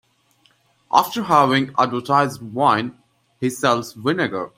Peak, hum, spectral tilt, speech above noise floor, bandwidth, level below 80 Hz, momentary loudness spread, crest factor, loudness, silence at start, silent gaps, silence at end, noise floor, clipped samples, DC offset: 0 dBFS; none; -5 dB/octave; 41 dB; 16 kHz; -62 dBFS; 7 LU; 20 dB; -19 LUFS; 0.9 s; none; 0.1 s; -60 dBFS; under 0.1%; under 0.1%